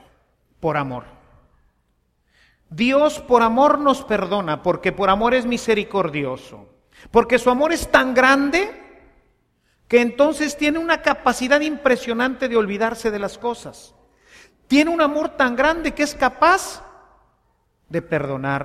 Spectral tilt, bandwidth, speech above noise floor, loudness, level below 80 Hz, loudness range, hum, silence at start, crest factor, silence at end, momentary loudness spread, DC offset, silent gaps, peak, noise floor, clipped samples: -4.5 dB/octave; 15 kHz; 47 dB; -19 LUFS; -46 dBFS; 3 LU; none; 0.6 s; 20 dB; 0 s; 12 LU; under 0.1%; none; 0 dBFS; -66 dBFS; under 0.1%